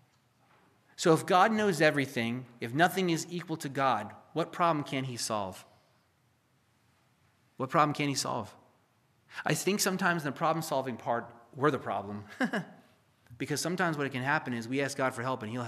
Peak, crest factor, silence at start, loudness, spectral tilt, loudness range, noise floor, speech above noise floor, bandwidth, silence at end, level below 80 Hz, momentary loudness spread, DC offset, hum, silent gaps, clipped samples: -10 dBFS; 22 dB; 1 s; -31 LUFS; -4.5 dB/octave; 6 LU; -70 dBFS; 40 dB; 15 kHz; 0 s; -80 dBFS; 11 LU; under 0.1%; none; none; under 0.1%